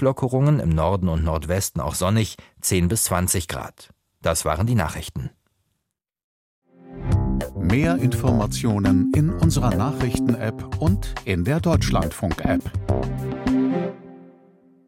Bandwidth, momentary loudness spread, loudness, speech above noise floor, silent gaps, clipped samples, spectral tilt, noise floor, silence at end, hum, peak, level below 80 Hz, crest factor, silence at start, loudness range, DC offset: 16.5 kHz; 8 LU; -22 LUFS; 59 dB; 6.24-6.62 s; under 0.1%; -6 dB/octave; -80 dBFS; 0.6 s; none; -4 dBFS; -34 dBFS; 16 dB; 0 s; 6 LU; under 0.1%